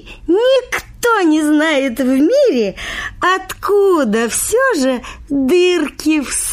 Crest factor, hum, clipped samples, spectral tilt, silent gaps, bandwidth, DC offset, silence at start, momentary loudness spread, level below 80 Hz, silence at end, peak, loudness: 12 dB; none; under 0.1%; -3 dB/octave; none; 15.5 kHz; under 0.1%; 0.05 s; 6 LU; -40 dBFS; 0 s; -2 dBFS; -14 LUFS